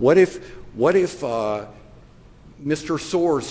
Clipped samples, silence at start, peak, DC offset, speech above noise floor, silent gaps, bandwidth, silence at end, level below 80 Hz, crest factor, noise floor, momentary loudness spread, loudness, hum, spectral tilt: under 0.1%; 0 s; -4 dBFS; under 0.1%; 27 dB; none; 8 kHz; 0 s; -50 dBFS; 16 dB; -47 dBFS; 18 LU; -21 LUFS; none; -6 dB/octave